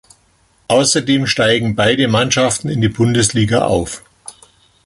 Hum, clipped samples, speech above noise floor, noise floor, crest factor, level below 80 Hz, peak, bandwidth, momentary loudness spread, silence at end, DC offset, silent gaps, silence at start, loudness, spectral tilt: none; under 0.1%; 41 dB; -56 dBFS; 16 dB; -42 dBFS; 0 dBFS; 11.5 kHz; 5 LU; 0.55 s; under 0.1%; none; 0.7 s; -14 LUFS; -4 dB/octave